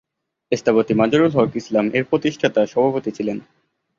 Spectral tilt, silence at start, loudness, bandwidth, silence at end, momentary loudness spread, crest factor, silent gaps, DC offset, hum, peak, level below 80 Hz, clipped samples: -6.5 dB/octave; 0.5 s; -19 LUFS; 7.4 kHz; 0.6 s; 9 LU; 18 dB; none; under 0.1%; none; -2 dBFS; -56 dBFS; under 0.1%